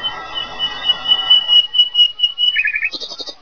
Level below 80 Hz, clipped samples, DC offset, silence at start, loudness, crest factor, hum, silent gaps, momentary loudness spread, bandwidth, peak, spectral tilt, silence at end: -50 dBFS; under 0.1%; 0.8%; 0 s; -12 LUFS; 14 dB; none; none; 15 LU; 5.4 kHz; -2 dBFS; 0 dB/octave; 0.1 s